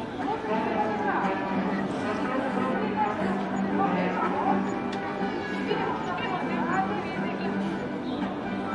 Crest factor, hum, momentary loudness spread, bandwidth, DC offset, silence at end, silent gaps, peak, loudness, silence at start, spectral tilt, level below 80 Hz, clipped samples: 16 dB; none; 5 LU; 10.5 kHz; under 0.1%; 0 s; none; -12 dBFS; -28 LUFS; 0 s; -7 dB/octave; -58 dBFS; under 0.1%